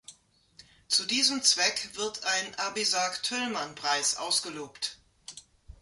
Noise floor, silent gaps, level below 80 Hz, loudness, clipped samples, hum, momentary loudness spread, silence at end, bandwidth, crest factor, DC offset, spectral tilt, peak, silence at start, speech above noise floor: -58 dBFS; none; -64 dBFS; -27 LUFS; under 0.1%; none; 14 LU; 0.1 s; 12 kHz; 22 dB; under 0.1%; 0 dB/octave; -10 dBFS; 0.1 s; 29 dB